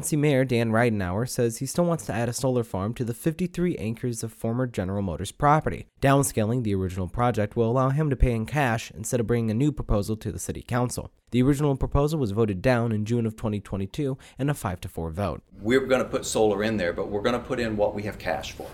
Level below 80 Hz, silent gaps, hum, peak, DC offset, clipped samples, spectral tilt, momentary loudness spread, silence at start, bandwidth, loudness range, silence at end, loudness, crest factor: -40 dBFS; none; none; -8 dBFS; under 0.1%; under 0.1%; -6 dB/octave; 9 LU; 0 s; 17 kHz; 3 LU; 0 s; -26 LUFS; 18 dB